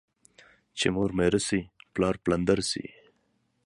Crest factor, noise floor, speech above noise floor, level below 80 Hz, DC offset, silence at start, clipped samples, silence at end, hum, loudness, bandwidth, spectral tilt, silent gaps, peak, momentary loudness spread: 22 dB; -72 dBFS; 46 dB; -50 dBFS; under 0.1%; 0.75 s; under 0.1%; 0.8 s; none; -27 LUFS; 11.5 kHz; -4.5 dB/octave; none; -8 dBFS; 11 LU